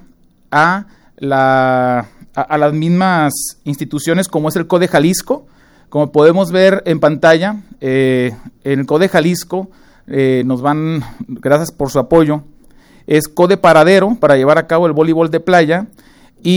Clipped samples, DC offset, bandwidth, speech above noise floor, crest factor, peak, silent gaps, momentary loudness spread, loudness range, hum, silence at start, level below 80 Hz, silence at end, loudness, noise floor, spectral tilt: under 0.1%; under 0.1%; over 20 kHz; 35 dB; 12 dB; 0 dBFS; none; 12 LU; 4 LU; none; 0.5 s; -46 dBFS; 0 s; -13 LUFS; -47 dBFS; -6 dB/octave